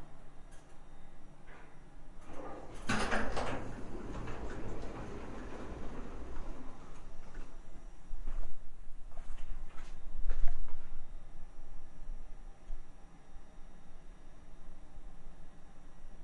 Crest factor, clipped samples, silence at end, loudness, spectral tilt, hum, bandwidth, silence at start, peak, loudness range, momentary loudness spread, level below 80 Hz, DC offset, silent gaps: 22 dB; under 0.1%; 0 s; -45 LUFS; -5 dB/octave; none; 10 kHz; 0 s; -10 dBFS; 16 LU; 18 LU; -42 dBFS; under 0.1%; none